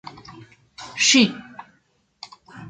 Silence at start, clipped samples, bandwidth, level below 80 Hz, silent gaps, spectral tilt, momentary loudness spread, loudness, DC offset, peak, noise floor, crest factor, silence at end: 0.3 s; under 0.1%; 9.4 kHz; -64 dBFS; none; -2 dB/octave; 27 LU; -17 LUFS; under 0.1%; -2 dBFS; -64 dBFS; 22 dB; 0 s